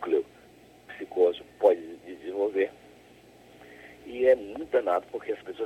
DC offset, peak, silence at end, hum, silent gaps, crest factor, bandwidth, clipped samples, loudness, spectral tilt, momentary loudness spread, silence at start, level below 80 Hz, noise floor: under 0.1%; -8 dBFS; 0 s; 60 Hz at -65 dBFS; none; 20 dB; 12.5 kHz; under 0.1%; -27 LUFS; -5.5 dB/octave; 21 LU; 0 s; -66 dBFS; -54 dBFS